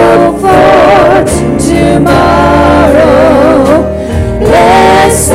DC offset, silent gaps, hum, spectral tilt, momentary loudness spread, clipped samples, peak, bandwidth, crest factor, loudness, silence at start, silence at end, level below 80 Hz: under 0.1%; none; none; -5.5 dB/octave; 6 LU; 0.1%; 0 dBFS; 16 kHz; 4 dB; -5 LUFS; 0 s; 0 s; -20 dBFS